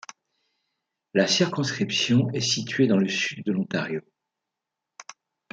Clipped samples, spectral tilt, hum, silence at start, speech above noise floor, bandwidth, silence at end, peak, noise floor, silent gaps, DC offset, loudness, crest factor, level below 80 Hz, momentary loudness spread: under 0.1%; -4.5 dB/octave; none; 1.15 s; 62 dB; 9.2 kHz; 0.4 s; -6 dBFS; -86 dBFS; none; under 0.1%; -24 LUFS; 20 dB; -70 dBFS; 10 LU